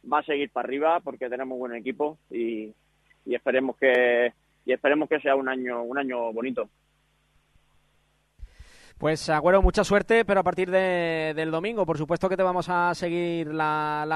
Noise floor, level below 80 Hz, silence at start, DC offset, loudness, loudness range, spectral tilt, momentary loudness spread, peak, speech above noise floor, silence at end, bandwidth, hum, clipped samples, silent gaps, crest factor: -67 dBFS; -40 dBFS; 0.05 s; under 0.1%; -25 LUFS; 8 LU; -5.5 dB/octave; 11 LU; -8 dBFS; 43 dB; 0 s; 12 kHz; none; under 0.1%; none; 18 dB